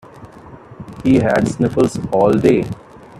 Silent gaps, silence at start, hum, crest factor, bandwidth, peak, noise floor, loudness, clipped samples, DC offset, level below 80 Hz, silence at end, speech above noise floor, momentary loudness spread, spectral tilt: none; 0.15 s; none; 16 dB; 13 kHz; 0 dBFS; -38 dBFS; -15 LUFS; under 0.1%; under 0.1%; -44 dBFS; 0 s; 24 dB; 18 LU; -7.5 dB/octave